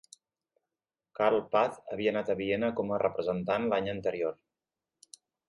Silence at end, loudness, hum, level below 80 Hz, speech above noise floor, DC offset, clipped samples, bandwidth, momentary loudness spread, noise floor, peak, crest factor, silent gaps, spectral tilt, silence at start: 1.15 s; -30 LUFS; none; -66 dBFS; over 60 dB; under 0.1%; under 0.1%; 11.5 kHz; 5 LU; under -90 dBFS; -12 dBFS; 20 dB; none; -6 dB/octave; 1.2 s